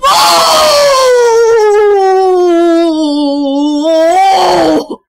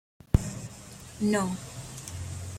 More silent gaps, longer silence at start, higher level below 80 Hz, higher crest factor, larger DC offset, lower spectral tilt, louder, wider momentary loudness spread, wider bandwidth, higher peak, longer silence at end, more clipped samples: neither; second, 0 s vs 0.35 s; about the same, -44 dBFS vs -40 dBFS; second, 8 dB vs 26 dB; neither; second, -2.5 dB/octave vs -6 dB/octave; first, -7 LUFS vs -31 LUFS; second, 6 LU vs 16 LU; about the same, 16 kHz vs 16.5 kHz; first, 0 dBFS vs -6 dBFS; first, 0.15 s vs 0 s; neither